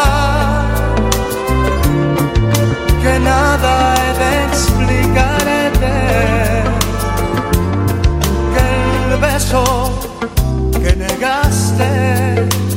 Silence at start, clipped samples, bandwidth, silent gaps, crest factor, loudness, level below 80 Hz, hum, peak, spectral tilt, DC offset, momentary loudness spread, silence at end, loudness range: 0 s; under 0.1%; 16.5 kHz; none; 12 dB; -14 LUFS; -18 dBFS; none; 0 dBFS; -5 dB/octave; under 0.1%; 4 LU; 0 s; 2 LU